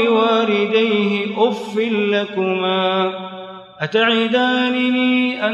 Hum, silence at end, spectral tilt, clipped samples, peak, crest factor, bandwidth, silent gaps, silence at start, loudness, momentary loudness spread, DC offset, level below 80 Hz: none; 0 s; -6 dB/octave; under 0.1%; -4 dBFS; 14 dB; 8.4 kHz; none; 0 s; -17 LUFS; 7 LU; under 0.1%; -70 dBFS